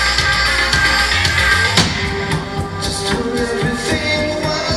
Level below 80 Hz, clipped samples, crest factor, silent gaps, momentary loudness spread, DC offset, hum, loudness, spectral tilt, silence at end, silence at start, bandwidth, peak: -28 dBFS; under 0.1%; 16 dB; none; 8 LU; under 0.1%; none; -15 LUFS; -3.5 dB/octave; 0 s; 0 s; 15.5 kHz; 0 dBFS